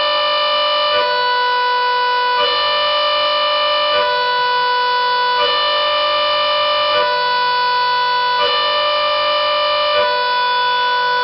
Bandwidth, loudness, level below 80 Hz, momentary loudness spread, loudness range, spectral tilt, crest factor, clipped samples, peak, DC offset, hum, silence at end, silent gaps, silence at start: 6 kHz; -14 LUFS; -56 dBFS; 1 LU; 0 LU; -3 dB/octave; 10 dB; under 0.1%; -6 dBFS; under 0.1%; none; 0 s; none; 0 s